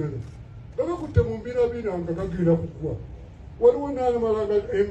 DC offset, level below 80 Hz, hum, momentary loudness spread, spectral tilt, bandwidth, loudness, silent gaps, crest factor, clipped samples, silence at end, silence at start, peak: under 0.1%; -42 dBFS; none; 18 LU; -9 dB/octave; 8.2 kHz; -25 LUFS; none; 18 dB; under 0.1%; 0 s; 0 s; -6 dBFS